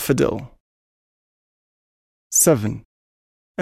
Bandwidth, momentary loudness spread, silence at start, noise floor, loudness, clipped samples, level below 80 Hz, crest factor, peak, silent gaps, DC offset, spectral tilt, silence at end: 16 kHz; 20 LU; 0 s; under -90 dBFS; -18 LUFS; under 0.1%; -52 dBFS; 22 dB; -2 dBFS; 0.60-2.31 s, 2.85-3.55 s; under 0.1%; -4.5 dB/octave; 0 s